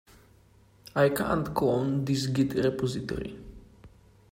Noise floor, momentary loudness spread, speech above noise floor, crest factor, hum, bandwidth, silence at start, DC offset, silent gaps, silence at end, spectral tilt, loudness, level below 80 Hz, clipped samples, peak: -59 dBFS; 10 LU; 32 dB; 20 dB; none; 16 kHz; 0.95 s; under 0.1%; none; 0.45 s; -6.5 dB/octave; -28 LUFS; -52 dBFS; under 0.1%; -10 dBFS